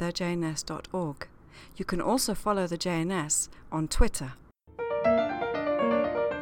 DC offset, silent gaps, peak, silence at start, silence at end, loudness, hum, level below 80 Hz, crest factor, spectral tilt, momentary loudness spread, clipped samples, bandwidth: under 0.1%; none; -10 dBFS; 0 s; 0 s; -29 LUFS; none; -38 dBFS; 20 dB; -4 dB/octave; 11 LU; under 0.1%; 17.5 kHz